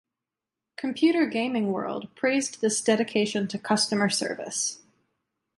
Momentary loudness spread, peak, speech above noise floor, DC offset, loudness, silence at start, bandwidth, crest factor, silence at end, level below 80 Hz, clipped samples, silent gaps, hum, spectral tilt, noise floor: 10 LU; -8 dBFS; 63 dB; under 0.1%; -26 LUFS; 0.8 s; 11.5 kHz; 18 dB; 0.8 s; -72 dBFS; under 0.1%; none; none; -3.5 dB/octave; -88 dBFS